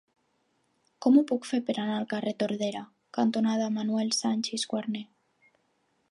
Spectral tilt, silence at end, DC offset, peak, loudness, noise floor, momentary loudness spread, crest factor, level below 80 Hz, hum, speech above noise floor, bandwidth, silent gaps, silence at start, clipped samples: -4.5 dB/octave; 1.05 s; under 0.1%; -10 dBFS; -28 LUFS; -73 dBFS; 10 LU; 18 dB; -82 dBFS; none; 45 dB; 11.5 kHz; none; 1 s; under 0.1%